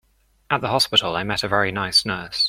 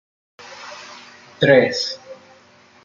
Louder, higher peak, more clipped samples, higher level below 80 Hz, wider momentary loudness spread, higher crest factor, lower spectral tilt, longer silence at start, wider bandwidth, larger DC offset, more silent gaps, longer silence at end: second, -20 LUFS vs -17 LUFS; about the same, -2 dBFS vs -2 dBFS; neither; first, -52 dBFS vs -62 dBFS; second, 7 LU vs 25 LU; about the same, 20 dB vs 20 dB; second, -3 dB/octave vs -5 dB/octave; about the same, 0.5 s vs 0.4 s; first, 16.5 kHz vs 7.6 kHz; neither; neither; second, 0 s vs 0.7 s